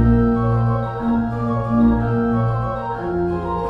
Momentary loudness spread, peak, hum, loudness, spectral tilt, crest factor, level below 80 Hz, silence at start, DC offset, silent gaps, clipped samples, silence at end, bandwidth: 6 LU; -4 dBFS; none; -19 LUFS; -10.5 dB/octave; 14 dB; -30 dBFS; 0 s; under 0.1%; none; under 0.1%; 0 s; 5 kHz